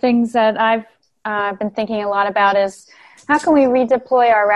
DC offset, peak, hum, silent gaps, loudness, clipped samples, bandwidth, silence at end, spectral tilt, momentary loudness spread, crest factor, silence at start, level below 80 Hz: under 0.1%; -4 dBFS; none; none; -16 LUFS; under 0.1%; 11.5 kHz; 0 s; -5 dB/octave; 9 LU; 12 dB; 0.05 s; -58 dBFS